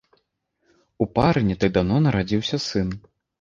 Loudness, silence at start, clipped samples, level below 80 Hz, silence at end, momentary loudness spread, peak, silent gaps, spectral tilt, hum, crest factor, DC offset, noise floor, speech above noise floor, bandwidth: -22 LUFS; 1 s; under 0.1%; -42 dBFS; 0.4 s; 8 LU; -4 dBFS; none; -6.5 dB/octave; none; 20 dB; under 0.1%; -72 dBFS; 51 dB; 7.4 kHz